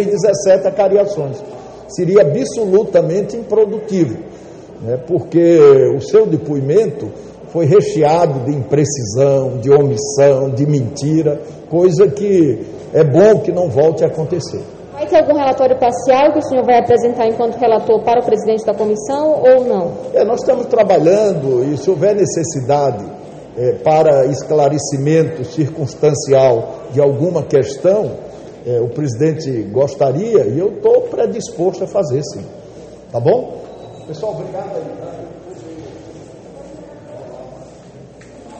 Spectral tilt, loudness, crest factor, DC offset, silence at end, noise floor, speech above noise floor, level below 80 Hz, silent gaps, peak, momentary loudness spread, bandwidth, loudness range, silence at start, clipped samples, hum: -6.5 dB/octave; -14 LUFS; 14 dB; under 0.1%; 0 s; -37 dBFS; 24 dB; -50 dBFS; none; 0 dBFS; 18 LU; 8.8 kHz; 8 LU; 0 s; under 0.1%; none